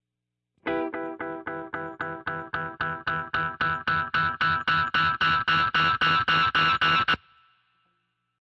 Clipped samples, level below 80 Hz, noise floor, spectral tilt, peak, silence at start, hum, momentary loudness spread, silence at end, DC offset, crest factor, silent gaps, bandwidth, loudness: under 0.1%; -56 dBFS; -84 dBFS; -5 dB/octave; -12 dBFS; 0.65 s; 60 Hz at -60 dBFS; 13 LU; 1.25 s; under 0.1%; 14 dB; none; 7.6 kHz; -25 LUFS